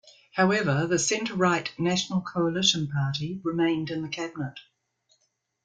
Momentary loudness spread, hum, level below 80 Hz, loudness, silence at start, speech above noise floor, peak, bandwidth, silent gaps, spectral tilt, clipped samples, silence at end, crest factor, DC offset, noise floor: 10 LU; none; -64 dBFS; -26 LUFS; 0.05 s; 47 dB; -8 dBFS; 9.4 kHz; none; -4 dB/octave; under 0.1%; 1.05 s; 20 dB; under 0.1%; -73 dBFS